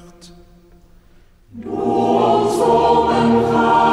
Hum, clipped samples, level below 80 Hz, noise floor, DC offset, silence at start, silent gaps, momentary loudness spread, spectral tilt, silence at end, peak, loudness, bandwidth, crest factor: none; under 0.1%; -46 dBFS; -48 dBFS; under 0.1%; 0.25 s; none; 9 LU; -6 dB/octave; 0 s; -2 dBFS; -15 LUFS; 13.5 kHz; 14 dB